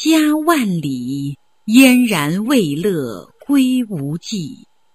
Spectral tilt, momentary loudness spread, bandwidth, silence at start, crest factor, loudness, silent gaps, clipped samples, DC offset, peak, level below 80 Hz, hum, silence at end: -5 dB/octave; 16 LU; 14 kHz; 0 s; 16 dB; -16 LUFS; none; under 0.1%; 0.1%; 0 dBFS; -56 dBFS; none; 0.4 s